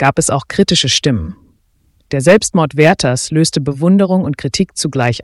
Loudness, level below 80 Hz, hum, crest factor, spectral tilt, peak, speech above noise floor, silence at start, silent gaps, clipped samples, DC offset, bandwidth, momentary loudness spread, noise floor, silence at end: -13 LUFS; -40 dBFS; none; 14 dB; -4.5 dB/octave; 0 dBFS; 43 dB; 0 s; none; under 0.1%; under 0.1%; 12 kHz; 6 LU; -56 dBFS; 0 s